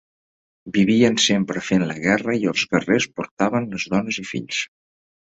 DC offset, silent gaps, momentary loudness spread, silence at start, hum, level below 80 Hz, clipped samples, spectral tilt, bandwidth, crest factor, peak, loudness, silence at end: under 0.1%; 3.31-3.37 s; 10 LU; 0.65 s; none; -56 dBFS; under 0.1%; -4.5 dB/octave; 8.2 kHz; 20 dB; -2 dBFS; -20 LUFS; 0.6 s